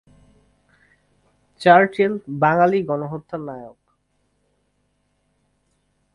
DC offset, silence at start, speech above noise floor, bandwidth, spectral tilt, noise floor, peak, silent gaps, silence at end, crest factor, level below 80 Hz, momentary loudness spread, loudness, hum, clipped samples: under 0.1%; 1.6 s; 50 dB; 11 kHz; -7.5 dB/octave; -68 dBFS; 0 dBFS; none; 2.45 s; 22 dB; -62 dBFS; 17 LU; -18 LUFS; 50 Hz at -50 dBFS; under 0.1%